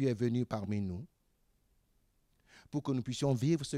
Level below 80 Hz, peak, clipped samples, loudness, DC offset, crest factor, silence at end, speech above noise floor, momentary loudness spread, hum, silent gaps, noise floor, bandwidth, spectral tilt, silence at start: -66 dBFS; -20 dBFS; under 0.1%; -35 LUFS; under 0.1%; 16 dB; 0 s; 40 dB; 10 LU; none; none; -74 dBFS; 14 kHz; -7 dB/octave; 0 s